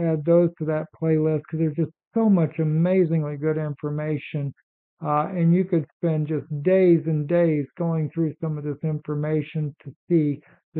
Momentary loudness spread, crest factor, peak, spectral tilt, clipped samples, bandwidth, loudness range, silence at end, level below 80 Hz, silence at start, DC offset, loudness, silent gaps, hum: 9 LU; 14 dB; -8 dBFS; -10 dB/octave; under 0.1%; 4 kHz; 3 LU; 0 s; -68 dBFS; 0 s; under 0.1%; -23 LUFS; 2.07-2.11 s, 4.63-4.97 s, 5.93-6.00 s, 9.96-10.07 s, 10.63-10.72 s; none